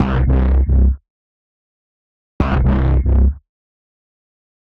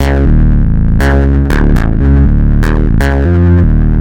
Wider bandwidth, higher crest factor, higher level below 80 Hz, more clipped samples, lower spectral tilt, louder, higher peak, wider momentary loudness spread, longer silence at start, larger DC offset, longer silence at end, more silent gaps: second, 3.9 kHz vs 11.5 kHz; about the same, 12 dB vs 8 dB; second, -18 dBFS vs -10 dBFS; neither; first, -10 dB/octave vs -8.5 dB/octave; second, -16 LUFS vs -10 LUFS; second, -4 dBFS vs 0 dBFS; first, 7 LU vs 3 LU; about the same, 0 s vs 0 s; neither; first, 1.4 s vs 0 s; first, 1.10-2.39 s vs none